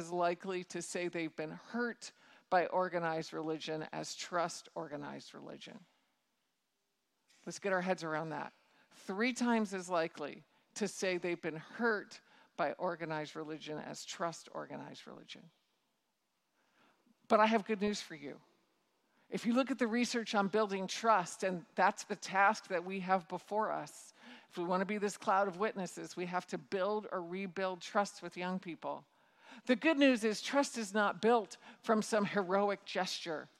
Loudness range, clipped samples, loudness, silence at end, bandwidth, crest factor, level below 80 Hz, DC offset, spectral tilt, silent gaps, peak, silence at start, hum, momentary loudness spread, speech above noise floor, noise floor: 9 LU; under 0.1%; -36 LUFS; 0.15 s; 14 kHz; 22 dB; -84 dBFS; under 0.1%; -4.5 dB/octave; none; -14 dBFS; 0 s; none; 17 LU; 48 dB; -84 dBFS